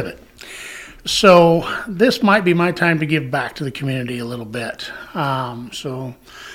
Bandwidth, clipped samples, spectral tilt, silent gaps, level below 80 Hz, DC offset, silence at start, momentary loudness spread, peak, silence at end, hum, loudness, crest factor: 16 kHz; under 0.1%; -5 dB/octave; none; -48 dBFS; under 0.1%; 0 s; 20 LU; 0 dBFS; 0 s; none; -17 LUFS; 18 dB